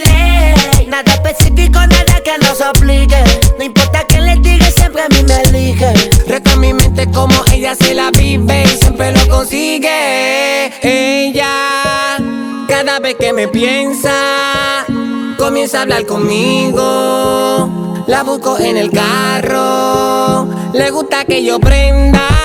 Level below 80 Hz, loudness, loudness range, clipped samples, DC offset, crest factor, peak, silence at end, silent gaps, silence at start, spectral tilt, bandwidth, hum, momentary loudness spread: -14 dBFS; -10 LUFS; 3 LU; 1%; under 0.1%; 10 dB; 0 dBFS; 0 s; none; 0 s; -4.5 dB/octave; over 20 kHz; none; 5 LU